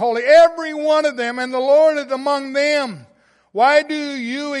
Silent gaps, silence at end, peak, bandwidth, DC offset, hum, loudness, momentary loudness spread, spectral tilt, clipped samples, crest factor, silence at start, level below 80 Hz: none; 0 s; -2 dBFS; 11.5 kHz; under 0.1%; none; -16 LUFS; 13 LU; -3 dB/octave; under 0.1%; 14 dB; 0 s; -66 dBFS